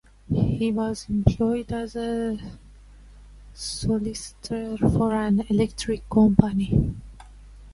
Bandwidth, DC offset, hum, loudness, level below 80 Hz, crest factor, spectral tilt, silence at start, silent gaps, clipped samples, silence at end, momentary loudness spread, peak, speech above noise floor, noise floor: 11.5 kHz; under 0.1%; 50 Hz at -45 dBFS; -24 LUFS; -38 dBFS; 24 dB; -7 dB/octave; 0.3 s; none; under 0.1%; 0 s; 12 LU; 0 dBFS; 24 dB; -47 dBFS